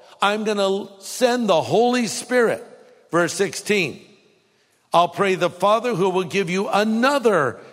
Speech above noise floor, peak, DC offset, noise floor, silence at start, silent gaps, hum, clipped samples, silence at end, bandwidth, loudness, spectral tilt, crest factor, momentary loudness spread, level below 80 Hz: 42 dB; -2 dBFS; under 0.1%; -62 dBFS; 0.2 s; none; none; under 0.1%; 0.05 s; 16 kHz; -20 LUFS; -4 dB/octave; 18 dB; 5 LU; -70 dBFS